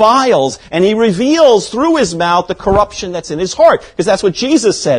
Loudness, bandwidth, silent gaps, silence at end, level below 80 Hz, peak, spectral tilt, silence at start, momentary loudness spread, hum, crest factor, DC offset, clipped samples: -12 LUFS; 10.5 kHz; none; 0 s; -38 dBFS; 0 dBFS; -4.5 dB/octave; 0 s; 8 LU; none; 12 dB; under 0.1%; 0.4%